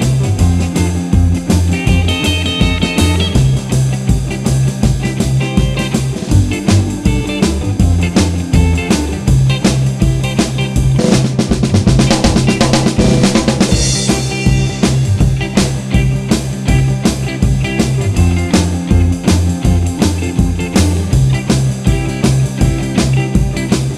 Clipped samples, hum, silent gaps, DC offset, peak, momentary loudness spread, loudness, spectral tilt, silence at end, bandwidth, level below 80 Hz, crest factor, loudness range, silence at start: under 0.1%; none; none; under 0.1%; 0 dBFS; 4 LU; -13 LUFS; -5.5 dB/octave; 0 s; 14 kHz; -20 dBFS; 12 dB; 2 LU; 0 s